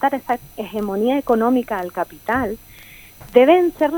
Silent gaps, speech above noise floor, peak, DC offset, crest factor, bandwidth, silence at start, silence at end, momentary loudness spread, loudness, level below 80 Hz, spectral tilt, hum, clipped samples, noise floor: none; 24 dB; 0 dBFS; under 0.1%; 18 dB; 19 kHz; 0 s; 0 s; 13 LU; -19 LUFS; -48 dBFS; -6 dB/octave; none; under 0.1%; -42 dBFS